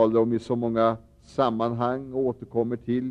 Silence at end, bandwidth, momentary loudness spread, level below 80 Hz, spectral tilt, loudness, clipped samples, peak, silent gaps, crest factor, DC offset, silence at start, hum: 0 s; 9.2 kHz; 5 LU; -58 dBFS; -8.5 dB/octave; -26 LUFS; under 0.1%; -8 dBFS; none; 16 dB; under 0.1%; 0 s; none